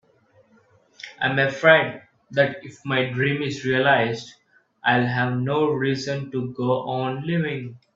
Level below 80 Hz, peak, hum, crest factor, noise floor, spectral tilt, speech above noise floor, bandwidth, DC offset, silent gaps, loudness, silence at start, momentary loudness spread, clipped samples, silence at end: -62 dBFS; 0 dBFS; none; 22 dB; -59 dBFS; -6 dB/octave; 37 dB; 7.6 kHz; under 0.1%; none; -22 LUFS; 1.05 s; 12 LU; under 0.1%; 0.2 s